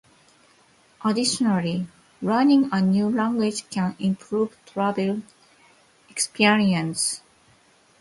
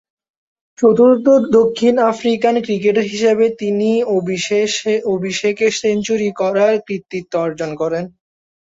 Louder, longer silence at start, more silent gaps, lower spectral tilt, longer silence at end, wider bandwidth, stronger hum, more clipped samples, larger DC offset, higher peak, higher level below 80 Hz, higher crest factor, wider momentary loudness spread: second, -23 LUFS vs -16 LUFS; first, 1 s vs 0.8 s; neither; about the same, -4.5 dB/octave vs -5 dB/octave; first, 0.85 s vs 0.55 s; first, 12 kHz vs 8 kHz; neither; neither; neither; about the same, -4 dBFS vs -2 dBFS; second, -64 dBFS vs -58 dBFS; first, 20 dB vs 14 dB; about the same, 11 LU vs 9 LU